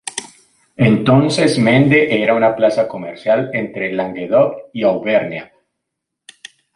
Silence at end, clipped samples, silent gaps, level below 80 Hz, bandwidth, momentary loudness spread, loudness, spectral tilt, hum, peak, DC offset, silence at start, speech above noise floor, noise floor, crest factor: 1.3 s; under 0.1%; none; -54 dBFS; 11.5 kHz; 10 LU; -15 LUFS; -6 dB/octave; none; -2 dBFS; under 0.1%; 0.05 s; 64 dB; -78 dBFS; 14 dB